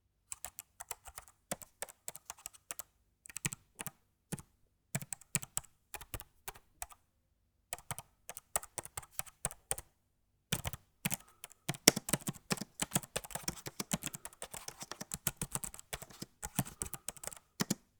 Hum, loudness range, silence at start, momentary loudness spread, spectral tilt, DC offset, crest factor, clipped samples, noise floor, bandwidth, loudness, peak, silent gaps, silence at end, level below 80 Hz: none; 11 LU; 0.3 s; 12 LU; -2.5 dB/octave; under 0.1%; 42 dB; under 0.1%; -77 dBFS; over 20 kHz; -40 LUFS; 0 dBFS; none; 0.25 s; -62 dBFS